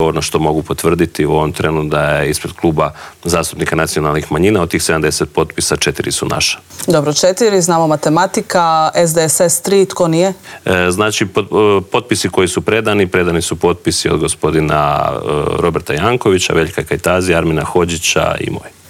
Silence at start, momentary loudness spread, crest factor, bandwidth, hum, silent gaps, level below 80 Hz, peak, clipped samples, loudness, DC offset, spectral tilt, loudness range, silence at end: 0 s; 5 LU; 12 dB; 16.5 kHz; none; none; -38 dBFS; 0 dBFS; under 0.1%; -13 LUFS; under 0.1%; -4 dB/octave; 3 LU; 0.2 s